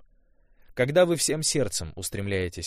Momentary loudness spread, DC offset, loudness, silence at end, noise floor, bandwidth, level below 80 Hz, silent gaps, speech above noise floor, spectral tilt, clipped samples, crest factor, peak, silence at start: 11 LU; under 0.1%; -25 LUFS; 0 s; -60 dBFS; 15.5 kHz; -50 dBFS; none; 35 dB; -3.5 dB/octave; under 0.1%; 18 dB; -8 dBFS; 0.7 s